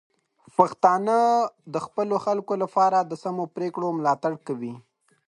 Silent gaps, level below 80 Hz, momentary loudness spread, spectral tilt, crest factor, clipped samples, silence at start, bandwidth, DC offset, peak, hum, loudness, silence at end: none; -70 dBFS; 11 LU; -6.5 dB/octave; 24 dB; under 0.1%; 0.6 s; 10.5 kHz; under 0.1%; -2 dBFS; none; -24 LUFS; 0.5 s